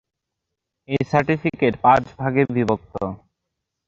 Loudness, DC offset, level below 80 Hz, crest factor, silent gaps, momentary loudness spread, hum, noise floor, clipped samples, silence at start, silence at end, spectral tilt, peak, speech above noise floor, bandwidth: -20 LUFS; under 0.1%; -52 dBFS; 20 dB; none; 12 LU; none; -81 dBFS; under 0.1%; 0.9 s; 0.7 s; -8 dB/octave; -2 dBFS; 61 dB; 7.6 kHz